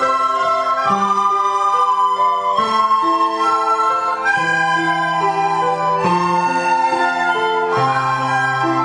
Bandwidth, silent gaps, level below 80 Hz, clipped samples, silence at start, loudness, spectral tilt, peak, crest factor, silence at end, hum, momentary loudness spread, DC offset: 11 kHz; none; -60 dBFS; under 0.1%; 0 s; -16 LUFS; -4.5 dB/octave; -4 dBFS; 12 dB; 0 s; none; 2 LU; under 0.1%